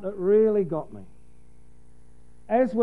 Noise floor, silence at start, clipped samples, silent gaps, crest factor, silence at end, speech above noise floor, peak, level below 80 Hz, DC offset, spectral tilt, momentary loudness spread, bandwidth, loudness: -55 dBFS; 0 s; under 0.1%; none; 16 dB; 0 s; 32 dB; -10 dBFS; -56 dBFS; 0.8%; -9.5 dB/octave; 20 LU; 3.8 kHz; -23 LUFS